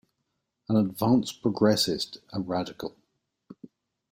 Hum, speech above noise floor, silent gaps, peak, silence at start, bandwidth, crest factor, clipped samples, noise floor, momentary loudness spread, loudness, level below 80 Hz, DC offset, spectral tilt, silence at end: none; 54 dB; none; -10 dBFS; 0.7 s; 16 kHz; 20 dB; under 0.1%; -80 dBFS; 15 LU; -26 LUFS; -64 dBFS; under 0.1%; -5.5 dB/octave; 0.45 s